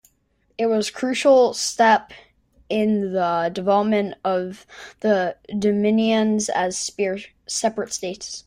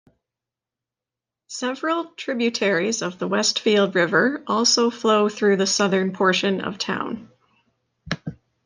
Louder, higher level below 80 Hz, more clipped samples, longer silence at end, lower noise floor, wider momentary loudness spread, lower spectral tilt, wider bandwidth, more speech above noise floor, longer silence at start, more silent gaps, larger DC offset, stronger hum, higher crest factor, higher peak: about the same, -21 LUFS vs -21 LUFS; about the same, -62 dBFS vs -62 dBFS; neither; second, 0.05 s vs 0.35 s; second, -66 dBFS vs -88 dBFS; about the same, 11 LU vs 12 LU; about the same, -4 dB/octave vs -3.5 dB/octave; first, 16 kHz vs 11 kHz; second, 45 dB vs 67 dB; second, 0.6 s vs 1.5 s; neither; neither; neither; about the same, 18 dB vs 18 dB; about the same, -4 dBFS vs -4 dBFS